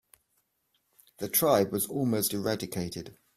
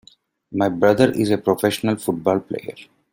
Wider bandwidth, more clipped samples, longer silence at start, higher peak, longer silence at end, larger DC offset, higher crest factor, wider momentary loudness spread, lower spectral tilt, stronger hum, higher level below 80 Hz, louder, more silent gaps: about the same, 16 kHz vs 16.5 kHz; neither; first, 1.2 s vs 0.5 s; second, -10 dBFS vs -2 dBFS; about the same, 0.25 s vs 0.3 s; neither; about the same, 22 dB vs 18 dB; about the same, 14 LU vs 14 LU; second, -4.5 dB/octave vs -6 dB/octave; neither; second, -64 dBFS vs -58 dBFS; second, -28 LUFS vs -20 LUFS; neither